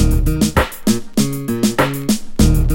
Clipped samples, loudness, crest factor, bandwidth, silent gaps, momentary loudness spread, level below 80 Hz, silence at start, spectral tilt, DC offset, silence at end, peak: under 0.1%; -17 LUFS; 14 dB; 17 kHz; none; 4 LU; -20 dBFS; 0 s; -5.5 dB/octave; under 0.1%; 0 s; 0 dBFS